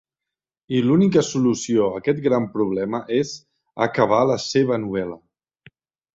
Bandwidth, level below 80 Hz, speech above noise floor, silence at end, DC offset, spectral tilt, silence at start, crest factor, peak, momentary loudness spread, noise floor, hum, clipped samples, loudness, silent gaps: 8 kHz; -58 dBFS; 67 dB; 0.95 s; under 0.1%; -6 dB/octave; 0.7 s; 18 dB; -4 dBFS; 11 LU; -87 dBFS; none; under 0.1%; -21 LUFS; none